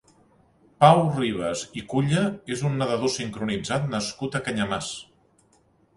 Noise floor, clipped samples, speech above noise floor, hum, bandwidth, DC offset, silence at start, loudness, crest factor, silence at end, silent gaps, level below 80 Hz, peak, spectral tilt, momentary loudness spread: -62 dBFS; under 0.1%; 38 dB; none; 11.5 kHz; under 0.1%; 0.8 s; -24 LUFS; 24 dB; 0.95 s; none; -56 dBFS; -2 dBFS; -5.5 dB/octave; 11 LU